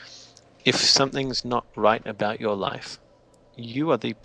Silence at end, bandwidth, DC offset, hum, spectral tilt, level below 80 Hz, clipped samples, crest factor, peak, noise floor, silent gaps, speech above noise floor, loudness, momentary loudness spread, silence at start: 0.1 s; 11 kHz; under 0.1%; none; -3 dB/octave; -56 dBFS; under 0.1%; 22 dB; -4 dBFS; -56 dBFS; none; 32 dB; -23 LUFS; 20 LU; 0 s